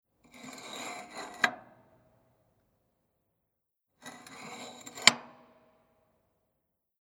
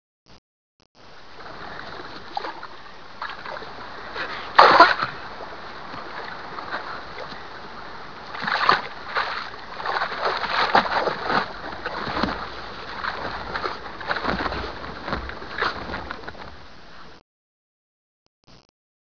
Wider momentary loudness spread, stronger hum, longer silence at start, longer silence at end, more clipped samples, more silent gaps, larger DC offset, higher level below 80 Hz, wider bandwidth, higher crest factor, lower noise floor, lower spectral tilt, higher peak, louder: first, 26 LU vs 18 LU; neither; about the same, 0.35 s vs 0.25 s; first, 1.7 s vs 0.45 s; neither; second, none vs 0.38-0.79 s, 0.86-0.95 s, 17.21-18.43 s; second, under 0.1% vs 0.9%; second, -78 dBFS vs -48 dBFS; first, over 20 kHz vs 5.4 kHz; first, 38 dB vs 26 dB; second, -83 dBFS vs under -90 dBFS; second, 0 dB/octave vs -4.5 dB/octave; about the same, 0 dBFS vs 0 dBFS; second, -28 LUFS vs -24 LUFS